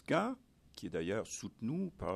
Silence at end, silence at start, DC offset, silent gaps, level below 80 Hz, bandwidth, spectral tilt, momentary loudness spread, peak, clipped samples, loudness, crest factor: 0 s; 0.1 s; under 0.1%; none; -64 dBFS; 14 kHz; -5.5 dB/octave; 14 LU; -18 dBFS; under 0.1%; -39 LUFS; 20 dB